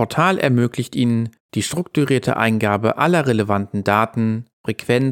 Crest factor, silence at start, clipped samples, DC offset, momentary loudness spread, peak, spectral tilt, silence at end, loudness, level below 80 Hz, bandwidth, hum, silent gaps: 18 dB; 0 s; under 0.1%; under 0.1%; 7 LU; -2 dBFS; -6 dB/octave; 0 s; -19 LUFS; -60 dBFS; 17 kHz; none; 1.40-1.49 s, 4.53-4.64 s